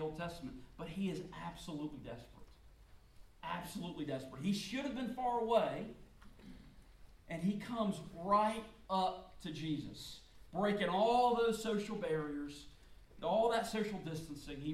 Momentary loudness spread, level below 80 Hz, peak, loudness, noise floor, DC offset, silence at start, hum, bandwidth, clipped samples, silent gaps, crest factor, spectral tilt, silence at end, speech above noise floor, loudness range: 17 LU; -62 dBFS; -20 dBFS; -38 LUFS; -61 dBFS; under 0.1%; 0 s; none; 15.5 kHz; under 0.1%; none; 20 dB; -5.5 dB/octave; 0 s; 23 dB; 10 LU